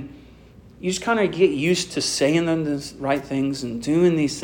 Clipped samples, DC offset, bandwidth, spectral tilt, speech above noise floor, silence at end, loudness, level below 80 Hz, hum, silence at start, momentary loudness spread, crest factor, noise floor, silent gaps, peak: under 0.1%; under 0.1%; 17 kHz; -5 dB/octave; 26 dB; 0 s; -22 LUFS; -52 dBFS; none; 0 s; 9 LU; 16 dB; -47 dBFS; none; -6 dBFS